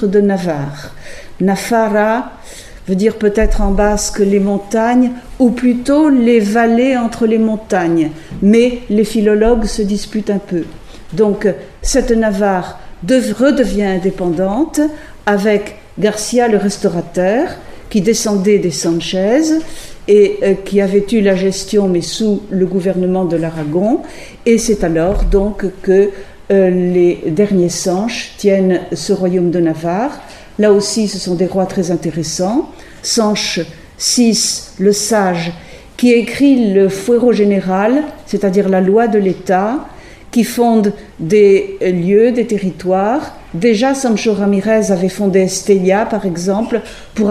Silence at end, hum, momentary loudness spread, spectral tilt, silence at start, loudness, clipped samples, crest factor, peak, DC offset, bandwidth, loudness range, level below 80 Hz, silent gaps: 0 s; none; 9 LU; -5 dB/octave; 0 s; -14 LUFS; under 0.1%; 14 dB; 0 dBFS; under 0.1%; 15 kHz; 3 LU; -30 dBFS; none